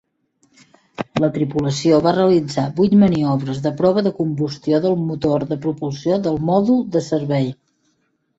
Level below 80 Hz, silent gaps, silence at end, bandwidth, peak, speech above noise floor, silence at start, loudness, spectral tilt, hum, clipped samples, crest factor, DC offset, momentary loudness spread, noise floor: -52 dBFS; none; 0.85 s; 8 kHz; -2 dBFS; 49 dB; 1 s; -18 LUFS; -7.5 dB/octave; none; under 0.1%; 16 dB; under 0.1%; 9 LU; -66 dBFS